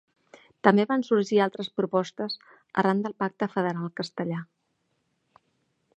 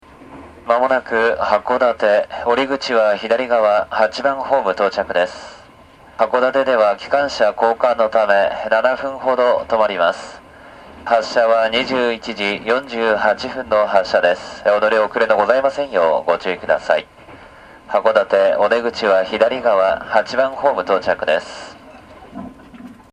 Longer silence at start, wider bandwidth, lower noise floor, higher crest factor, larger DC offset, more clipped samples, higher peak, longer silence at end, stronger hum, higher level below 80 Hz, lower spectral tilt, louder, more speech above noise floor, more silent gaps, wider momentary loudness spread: first, 0.65 s vs 0.2 s; second, 8.4 kHz vs 10 kHz; first, -75 dBFS vs -44 dBFS; first, 26 dB vs 18 dB; neither; neither; about the same, -2 dBFS vs 0 dBFS; first, 1.55 s vs 0.2 s; neither; second, -76 dBFS vs -52 dBFS; first, -6.5 dB/octave vs -4 dB/octave; second, -26 LUFS vs -17 LUFS; first, 49 dB vs 28 dB; neither; first, 11 LU vs 6 LU